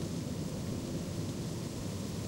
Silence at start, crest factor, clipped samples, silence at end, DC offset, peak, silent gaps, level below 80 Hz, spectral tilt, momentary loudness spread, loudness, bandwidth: 0 s; 12 dB; under 0.1%; 0 s; under 0.1%; -26 dBFS; none; -54 dBFS; -5.5 dB/octave; 1 LU; -38 LUFS; 16 kHz